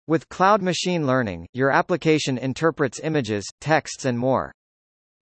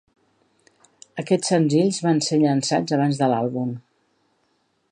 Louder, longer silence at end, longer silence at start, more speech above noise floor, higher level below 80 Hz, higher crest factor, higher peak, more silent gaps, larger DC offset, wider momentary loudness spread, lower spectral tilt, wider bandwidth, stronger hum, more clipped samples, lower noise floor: about the same, -22 LUFS vs -21 LUFS; second, 0.7 s vs 1.1 s; second, 0.1 s vs 1.15 s; first, over 68 dB vs 48 dB; first, -58 dBFS vs -70 dBFS; about the same, 18 dB vs 16 dB; first, -4 dBFS vs -8 dBFS; first, 1.49-1.53 s, 3.52-3.58 s vs none; neither; second, 7 LU vs 11 LU; about the same, -5 dB/octave vs -5.5 dB/octave; second, 8.8 kHz vs 10.5 kHz; neither; neither; first, under -90 dBFS vs -68 dBFS